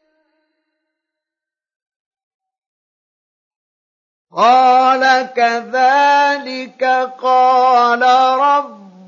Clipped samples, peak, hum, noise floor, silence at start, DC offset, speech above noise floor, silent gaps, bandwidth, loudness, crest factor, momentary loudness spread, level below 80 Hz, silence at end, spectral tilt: under 0.1%; -2 dBFS; none; -87 dBFS; 4.35 s; under 0.1%; 75 dB; none; 7.4 kHz; -12 LUFS; 14 dB; 8 LU; -84 dBFS; 0.3 s; -2.5 dB/octave